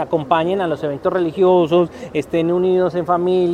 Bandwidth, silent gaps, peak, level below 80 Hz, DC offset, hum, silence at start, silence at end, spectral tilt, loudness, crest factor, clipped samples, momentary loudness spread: 8.8 kHz; none; 0 dBFS; -54 dBFS; under 0.1%; none; 0 s; 0 s; -8 dB/octave; -17 LUFS; 16 dB; under 0.1%; 7 LU